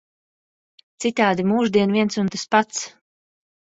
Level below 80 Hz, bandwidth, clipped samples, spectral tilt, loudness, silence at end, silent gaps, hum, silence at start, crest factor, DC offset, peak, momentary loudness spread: -62 dBFS; 8 kHz; under 0.1%; -4.5 dB/octave; -20 LUFS; 0.8 s; none; none; 1 s; 20 dB; under 0.1%; -2 dBFS; 9 LU